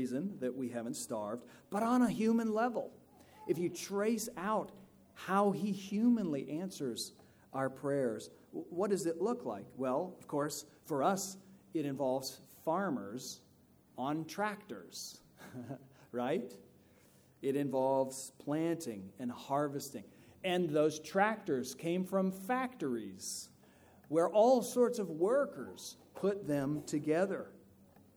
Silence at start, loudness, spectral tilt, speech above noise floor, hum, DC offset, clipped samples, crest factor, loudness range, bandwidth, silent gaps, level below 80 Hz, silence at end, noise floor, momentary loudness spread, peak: 0 s; -36 LUFS; -5.5 dB/octave; 30 dB; none; under 0.1%; under 0.1%; 20 dB; 7 LU; over 20 kHz; none; -76 dBFS; 0.6 s; -65 dBFS; 15 LU; -16 dBFS